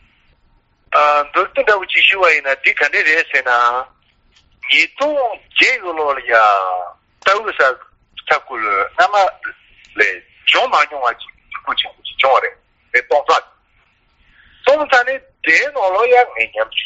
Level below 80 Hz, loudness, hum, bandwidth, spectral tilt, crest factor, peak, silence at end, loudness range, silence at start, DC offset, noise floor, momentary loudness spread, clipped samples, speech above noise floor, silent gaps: -56 dBFS; -14 LUFS; none; 8 kHz; 3 dB/octave; 16 dB; 0 dBFS; 0 s; 4 LU; 0.9 s; under 0.1%; -57 dBFS; 11 LU; under 0.1%; 42 dB; none